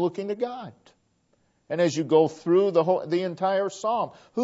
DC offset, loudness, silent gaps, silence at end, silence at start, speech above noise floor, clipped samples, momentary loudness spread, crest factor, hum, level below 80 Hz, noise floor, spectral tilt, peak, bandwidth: under 0.1%; -25 LUFS; none; 0 s; 0 s; 44 dB; under 0.1%; 11 LU; 18 dB; none; -76 dBFS; -68 dBFS; -6 dB/octave; -8 dBFS; 8 kHz